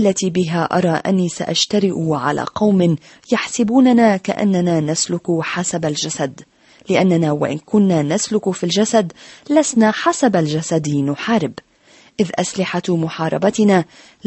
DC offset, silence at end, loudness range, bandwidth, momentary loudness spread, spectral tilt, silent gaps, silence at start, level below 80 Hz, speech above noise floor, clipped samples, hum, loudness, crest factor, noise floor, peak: under 0.1%; 0.45 s; 3 LU; 8.6 kHz; 6 LU; -5 dB/octave; none; 0 s; -56 dBFS; 33 dB; under 0.1%; none; -17 LUFS; 14 dB; -49 dBFS; -2 dBFS